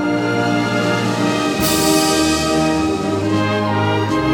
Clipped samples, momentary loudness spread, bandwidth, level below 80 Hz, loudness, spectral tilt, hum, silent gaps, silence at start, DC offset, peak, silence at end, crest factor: under 0.1%; 4 LU; 18 kHz; -40 dBFS; -16 LUFS; -4.5 dB/octave; none; none; 0 s; under 0.1%; -2 dBFS; 0 s; 14 dB